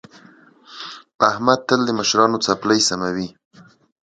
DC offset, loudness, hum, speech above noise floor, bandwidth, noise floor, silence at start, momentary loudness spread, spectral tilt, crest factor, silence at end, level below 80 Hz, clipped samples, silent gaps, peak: under 0.1%; -18 LUFS; none; 31 dB; 9.4 kHz; -49 dBFS; 0.7 s; 18 LU; -3 dB/octave; 20 dB; 0.75 s; -58 dBFS; under 0.1%; 1.15-1.19 s; 0 dBFS